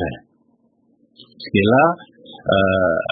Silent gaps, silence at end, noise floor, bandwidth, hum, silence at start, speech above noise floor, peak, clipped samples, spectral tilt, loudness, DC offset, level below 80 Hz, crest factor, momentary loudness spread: none; 0 s; -61 dBFS; 4.8 kHz; none; 0 s; 44 dB; -2 dBFS; under 0.1%; -11 dB/octave; -17 LUFS; under 0.1%; -50 dBFS; 18 dB; 18 LU